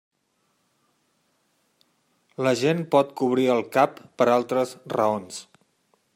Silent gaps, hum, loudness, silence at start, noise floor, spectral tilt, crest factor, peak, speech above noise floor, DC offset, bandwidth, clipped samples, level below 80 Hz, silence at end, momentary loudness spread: none; none; -23 LUFS; 2.4 s; -71 dBFS; -5.5 dB/octave; 20 dB; -6 dBFS; 48 dB; under 0.1%; 16 kHz; under 0.1%; -74 dBFS; 0.75 s; 9 LU